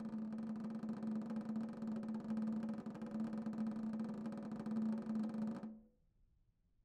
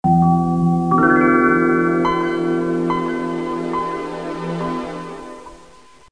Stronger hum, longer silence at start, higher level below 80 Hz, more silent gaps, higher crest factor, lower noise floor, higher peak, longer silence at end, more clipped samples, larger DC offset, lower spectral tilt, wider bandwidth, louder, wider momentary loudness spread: neither; about the same, 0 s vs 0.05 s; second, -76 dBFS vs -48 dBFS; neither; about the same, 12 dB vs 16 dB; first, -76 dBFS vs -47 dBFS; second, -32 dBFS vs -2 dBFS; first, 0.95 s vs 0.55 s; neither; second, under 0.1% vs 0.4%; about the same, -8.5 dB/octave vs -8 dB/octave; second, 8.8 kHz vs 10 kHz; second, -44 LUFS vs -18 LUFS; second, 5 LU vs 15 LU